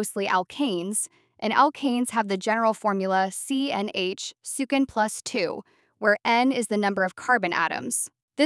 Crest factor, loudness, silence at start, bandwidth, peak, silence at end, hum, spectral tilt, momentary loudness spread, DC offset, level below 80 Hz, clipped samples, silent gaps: 18 dB; -25 LUFS; 0 s; 12 kHz; -6 dBFS; 0 s; none; -3.5 dB/octave; 8 LU; under 0.1%; -70 dBFS; under 0.1%; 8.22-8.28 s